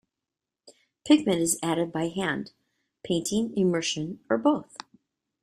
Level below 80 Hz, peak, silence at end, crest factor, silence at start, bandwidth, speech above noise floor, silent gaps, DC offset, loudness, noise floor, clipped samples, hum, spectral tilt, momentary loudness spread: -64 dBFS; -8 dBFS; 0.65 s; 20 dB; 0.65 s; 15.5 kHz; 62 dB; none; under 0.1%; -26 LUFS; -88 dBFS; under 0.1%; none; -4.5 dB/octave; 15 LU